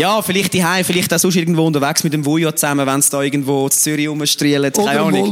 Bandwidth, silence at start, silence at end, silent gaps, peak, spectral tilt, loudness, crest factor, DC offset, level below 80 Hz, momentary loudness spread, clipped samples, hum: 17 kHz; 0 s; 0 s; none; -2 dBFS; -3.5 dB/octave; -15 LUFS; 14 dB; under 0.1%; -58 dBFS; 3 LU; under 0.1%; none